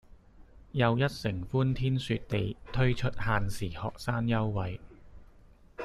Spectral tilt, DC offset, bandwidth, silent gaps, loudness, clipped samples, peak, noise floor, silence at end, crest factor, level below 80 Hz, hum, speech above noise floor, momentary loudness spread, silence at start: -7 dB/octave; under 0.1%; 13 kHz; none; -31 LUFS; under 0.1%; -12 dBFS; -56 dBFS; 0 s; 18 dB; -46 dBFS; none; 27 dB; 8 LU; 0.4 s